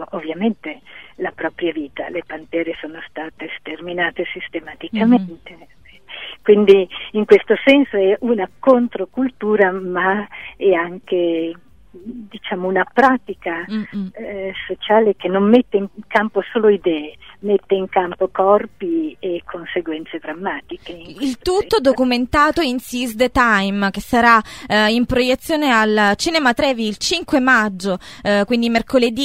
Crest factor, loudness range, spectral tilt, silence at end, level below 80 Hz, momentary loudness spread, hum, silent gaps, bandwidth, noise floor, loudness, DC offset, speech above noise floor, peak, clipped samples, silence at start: 18 dB; 7 LU; -5 dB/octave; 0 s; -46 dBFS; 15 LU; none; none; 16 kHz; -40 dBFS; -17 LUFS; 0.4%; 23 dB; 0 dBFS; under 0.1%; 0 s